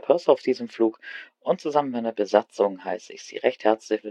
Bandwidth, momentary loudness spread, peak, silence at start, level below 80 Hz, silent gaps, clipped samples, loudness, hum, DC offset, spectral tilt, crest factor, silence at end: 9.4 kHz; 12 LU; -2 dBFS; 0.05 s; -78 dBFS; none; under 0.1%; -24 LUFS; none; under 0.1%; -5 dB/octave; 22 dB; 0 s